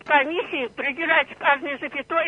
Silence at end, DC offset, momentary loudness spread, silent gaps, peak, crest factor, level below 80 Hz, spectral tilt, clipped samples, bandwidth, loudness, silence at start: 0 s; under 0.1%; 8 LU; none; -4 dBFS; 20 dB; -64 dBFS; -4.5 dB/octave; under 0.1%; 9.8 kHz; -22 LUFS; 0.05 s